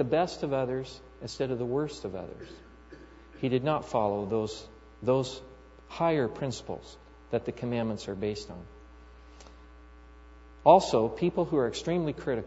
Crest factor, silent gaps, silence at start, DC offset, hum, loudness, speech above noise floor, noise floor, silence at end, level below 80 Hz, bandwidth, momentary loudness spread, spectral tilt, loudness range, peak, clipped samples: 24 dB; none; 0 s; under 0.1%; none; -29 LUFS; 22 dB; -51 dBFS; 0 s; -54 dBFS; 8 kHz; 17 LU; -6 dB/octave; 9 LU; -6 dBFS; under 0.1%